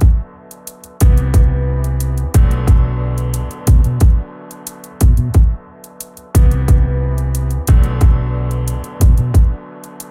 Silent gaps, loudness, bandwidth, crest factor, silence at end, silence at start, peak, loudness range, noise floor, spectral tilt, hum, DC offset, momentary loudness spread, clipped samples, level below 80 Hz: none; -15 LUFS; 16 kHz; 12 dB; 0 s; 0 s; 0 dBFS; 1 LU; -36 dBFS; -7 dB/octave; none; under 0.1%; 19 LU; under 0.1%; -14 dBFS